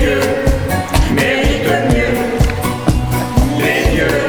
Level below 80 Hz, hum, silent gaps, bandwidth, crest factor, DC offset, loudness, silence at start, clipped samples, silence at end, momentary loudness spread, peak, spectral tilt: -20 dBFS; none; none; over 20 kHz; 14 dB; under 0.1%; -14 LUFS; 0 s; under 0.1%; 0 s; 3 LU; 0 dBFS; -5.5 dB/octave